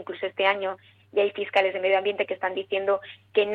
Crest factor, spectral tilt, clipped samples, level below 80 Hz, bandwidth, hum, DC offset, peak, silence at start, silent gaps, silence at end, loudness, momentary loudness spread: 20 dB; -5 dB/octave; under 0.1%; -76 dBFS; 6.2 kHz; none; under 0.1%; -6 dBFS; 0 s; none; 0 s; -26 LUFS; 7 LU